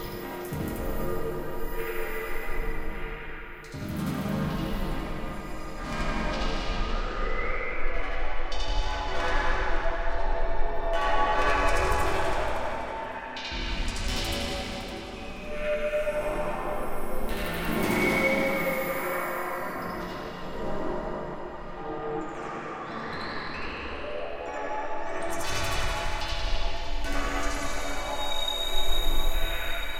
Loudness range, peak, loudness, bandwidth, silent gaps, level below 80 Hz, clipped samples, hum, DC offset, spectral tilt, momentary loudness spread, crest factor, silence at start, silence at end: 7 LU; -10 dBFS; -31 LUFS; 16.5 kHz; none; -32 dBFS; under 0.1%; none; under 0.1%; -4.5 dB/octave; 10 LU; 16 dB; 0 s; 0 s